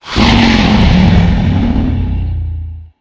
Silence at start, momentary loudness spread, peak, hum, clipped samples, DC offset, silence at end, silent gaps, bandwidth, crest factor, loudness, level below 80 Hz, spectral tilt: 0.05 s; 13 LU; 0 dBFS; none; 0.4%; under 0.1%; 0.15 s; none; 8 kHz; 10 dB; -11 LUFS; -16 dBFS; -6.5 dB/octave